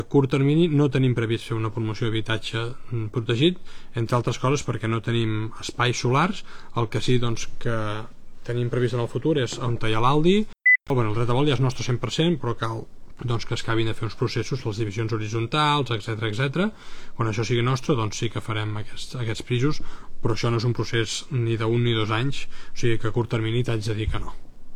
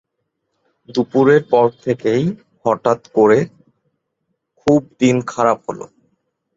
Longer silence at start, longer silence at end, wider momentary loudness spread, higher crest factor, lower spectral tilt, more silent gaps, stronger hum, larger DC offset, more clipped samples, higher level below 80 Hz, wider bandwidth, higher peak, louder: second, 0 s vs 0.9 s; second, 0 s vs 0.7 s; about the same, 11 LU vs 11 LU; about the same, 16 dB vs 16 dB; about the same, -6 dB/octave vs -6.5 dB/octave; neither; neither; neither; neither; first, -38 dBFS vs -58 dBFS; first, 11 kHz vs 7.8 kHz; second, -6 dBFS vs 0 dBFS; second, -24 LUFS vs -16 LUFS